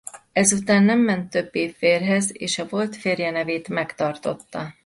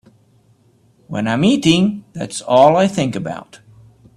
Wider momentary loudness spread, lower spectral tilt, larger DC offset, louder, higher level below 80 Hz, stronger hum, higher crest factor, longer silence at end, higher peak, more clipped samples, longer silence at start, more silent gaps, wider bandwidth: second, 10 LU vs 16 LU; second, -4 dB/octave vs -5.5 dB/octave; neither; second, -22 LUFS vs -15 LUFS; second, -62 dBFS vs -54 dBFS; neither; about the same, 18 dB vs 18 dB; second, 0.15 s vs 0.6 s; second, -4 dBFS vs 0 dBFS; neither; second, 0.15 s vs 1.1 s; neither; about the same, 11.5 kHz vs 12.5 kHz